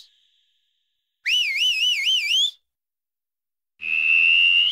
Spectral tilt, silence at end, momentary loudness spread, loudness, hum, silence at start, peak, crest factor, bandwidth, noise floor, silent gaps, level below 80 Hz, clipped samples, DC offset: 4.5 dB/octave; 0 s; 10 LU; -17 LUFS; none; 1.25 s; -10 dBFS; 12 dB; 16 kHz; under -90 dBFS; none; -74 dBFS; under 0.1%; under 0.1%